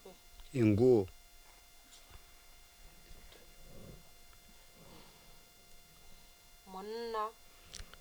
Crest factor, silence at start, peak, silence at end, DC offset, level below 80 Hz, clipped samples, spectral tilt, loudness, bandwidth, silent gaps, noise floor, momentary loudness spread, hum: 22 dB; 0.05 s; -16 dBFS; 0.15 s; under 0.1%; -60 dBFS; under 0.1%; -7 dB/octave; -33 LUFS; over 20 kHz; none; -59 dBFS; 28 LU; none